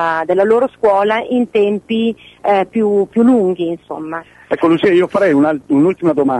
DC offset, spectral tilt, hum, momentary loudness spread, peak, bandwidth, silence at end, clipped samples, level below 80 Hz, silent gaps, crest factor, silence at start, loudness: under 0.1%; -7.5 dB/octave; none; 10 LU; -4 dBFS; 10.5 kHz; 0 s; under 0.1%; -56 dBFS; none; 10 dB; 0 s; -14 LUFS